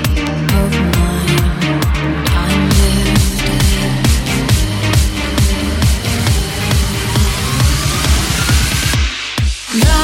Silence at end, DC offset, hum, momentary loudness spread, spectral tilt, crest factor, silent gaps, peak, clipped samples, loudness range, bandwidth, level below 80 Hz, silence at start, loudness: 0 s; under 0.1%; none; 3 LU; -4.5 dB/octave; 12 dB; none; 0 dBFS; under 0.1%; 1 LU; 16.5 kHz; -18 dBFS; 0 s; -14 LUFS